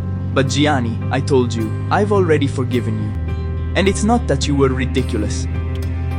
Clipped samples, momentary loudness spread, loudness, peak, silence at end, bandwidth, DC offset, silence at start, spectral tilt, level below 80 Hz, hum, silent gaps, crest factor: under 0.1%; 7 LU; -18 LUFS; -2 dBFS; 0 s; 11.5 kHz; under 0.1%; 0 s; -6 dB/octave; -28 dBFS; none; none; 14 dB